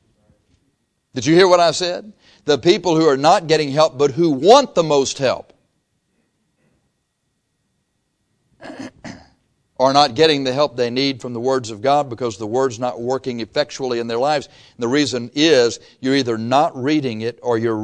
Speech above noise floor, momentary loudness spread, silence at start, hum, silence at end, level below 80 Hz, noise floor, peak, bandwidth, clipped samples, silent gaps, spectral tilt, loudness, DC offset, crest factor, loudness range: 54 dB; 12 LU; 1.15 s; none; 0 s; -58 dBFS; -71 dBFS; 0 dBFS; 10.5 kHz; under 0.1%; none; -4.5 dB/octave; -17 LUFS; under 0.1%; 18 dB; 6 LU